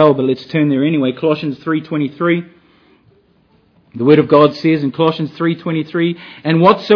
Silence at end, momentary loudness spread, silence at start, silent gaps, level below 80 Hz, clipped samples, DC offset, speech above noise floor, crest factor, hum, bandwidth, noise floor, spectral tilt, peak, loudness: 0 s; 9 LU; 0 s; none; -62 dBFS; 0.2%; under 0.1%; 40 dB; 14 dB; none; 5.4 kHz; -54 dBFS; -9 dB/octave; 0 dBFS; -15 LUFS